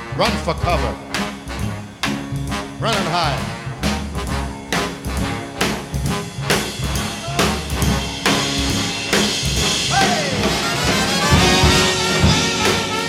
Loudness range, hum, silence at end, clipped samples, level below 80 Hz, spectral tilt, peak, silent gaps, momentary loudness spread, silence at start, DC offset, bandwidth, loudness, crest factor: 7 LU; none; 0 s; under 0.1%; -30 dBFS; -3.5 dB/octave; -2 dBFS; none; 10 LU; 0 s; under 0.1%; 17.5 kHz; -18 LUFS; 18 dB